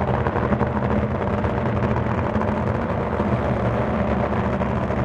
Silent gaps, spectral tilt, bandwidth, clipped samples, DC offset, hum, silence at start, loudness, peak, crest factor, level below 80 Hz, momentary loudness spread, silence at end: none; -9 dB/octave; 7.6 kHz; under 0.1%; under 0.1%; none; 0 s; -22 LUFS; -4 dBFS; 16 dB; -32 dBFS; 1 LU; 0 s